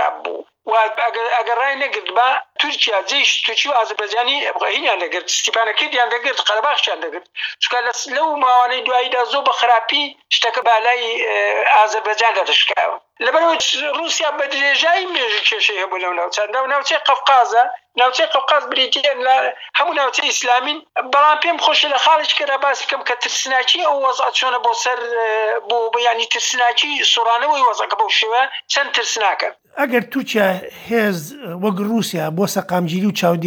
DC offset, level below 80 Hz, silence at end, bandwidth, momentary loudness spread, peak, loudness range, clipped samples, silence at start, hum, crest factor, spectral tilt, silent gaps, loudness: under 0.1%; -74 dBFS; 0 s; over 20 kHz; 6 LU; -2 dBFS; 2 LU; under 0.1%; 0 s; none; 14 dB; -2 dB/octave; none; -16 LUFS